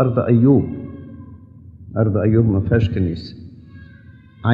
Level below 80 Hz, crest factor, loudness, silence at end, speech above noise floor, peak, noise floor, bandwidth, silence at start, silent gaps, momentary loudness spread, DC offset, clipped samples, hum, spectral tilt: -40 dBFS; 16 dB; -17 LUFS; 0 s; 28 dB; -2 dBFS; -43 dBFS; 5.2 kHz; 0 s; none; 22 LU; under 0.1%; under 0.1%; none; -10.5 dB/octave